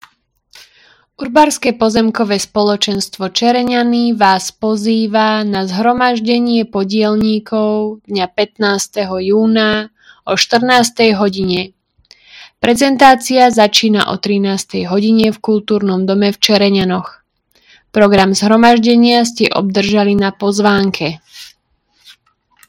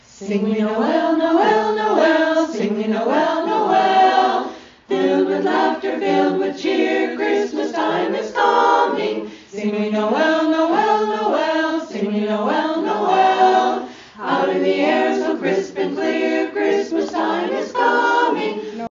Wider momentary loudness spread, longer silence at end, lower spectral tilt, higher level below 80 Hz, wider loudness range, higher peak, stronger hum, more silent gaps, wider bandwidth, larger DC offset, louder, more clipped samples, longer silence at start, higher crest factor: about the same, 9 LU vs 7 LU; first, 1.2 s vs 0.05 s; first, -4.5 dB/octave vs -3 dB/octave; first, -48 dBFS vs -64 dBFS; about the same, 4 LU vs 2 LU; about the same, 0 dBFS vs -2 dBFS; neither; neither; first, 16.5 kHz vs 7.4 kHz; neither; first, -12 LUFS vs -18 LUFS; first, 0.4% vs under 0.1%; first, 1.2 s vs 0.2 s; about the same, 12 dB vs 16 dB